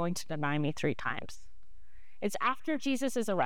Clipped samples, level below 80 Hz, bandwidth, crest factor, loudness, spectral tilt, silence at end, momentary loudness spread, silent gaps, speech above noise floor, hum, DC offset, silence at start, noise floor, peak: under 0.1%; -64 dBFS; 18.5 kHz; 18 dB; -33 LUFS; -5 dB/octave; 0 s; 8 LU; none; 27 dB; none; 1%; 0 s; -60 dBFS; -16 dBFS